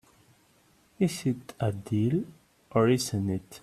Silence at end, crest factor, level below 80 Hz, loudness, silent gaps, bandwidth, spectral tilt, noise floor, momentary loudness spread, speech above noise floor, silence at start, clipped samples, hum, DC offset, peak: 0.05 s; 20 dB; -62 dBFS; -29 LUFS; none; 14.5 kHz; -6 dB/octave; -63 dBFS; 8 LU; 36 dB; 1 s; under 0.1%; none; under 0.1%; -10 dBFS